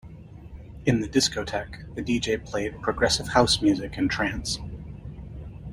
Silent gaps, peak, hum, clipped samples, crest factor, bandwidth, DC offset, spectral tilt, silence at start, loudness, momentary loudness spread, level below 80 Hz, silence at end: none; -4 dBFS; none; under 0.1%; 22 dB; 16 kHz; under 0.1%; -4 dB/octave; 0.05 s; -25 LUFS; 20 LU; -42 dBFS; 0 s